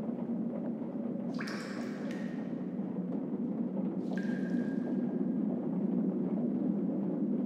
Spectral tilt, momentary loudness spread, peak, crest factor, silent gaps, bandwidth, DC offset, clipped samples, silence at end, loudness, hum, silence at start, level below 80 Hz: -8.5 dB/octave; 5 LU; -20 dBFS; 14 dB; none; 9.4 kHz; under 0.1%; under 0.1%; 0 s; -35 LUFS; none; 0 s; -78 dBFS